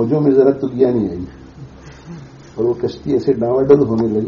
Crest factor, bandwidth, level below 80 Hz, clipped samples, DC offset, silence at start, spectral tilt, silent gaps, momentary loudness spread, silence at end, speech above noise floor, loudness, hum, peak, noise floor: 16 dB; 6.8 kHz; -44 dBFS; under 0.1%; under 0.1%; 0 s; -9 dB/octave; none; 22 LU; 0 s; 22 dB; -15 LUFS; none; 0 dBFS; -36 dBFS